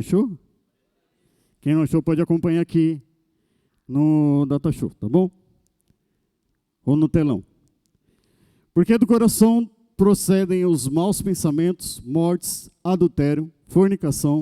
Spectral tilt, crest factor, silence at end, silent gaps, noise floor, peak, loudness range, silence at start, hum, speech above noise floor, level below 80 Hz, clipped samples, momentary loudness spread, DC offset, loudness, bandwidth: -7 dB/octave; 18 dB; 0 s; none; -73 dBFS; -4 dBFS; 5 LU; 0 s; none; 54 dB; -48 dBFS; under 0.1%; 10 LU; under 0.1%; -20 LUFS; 16 kHz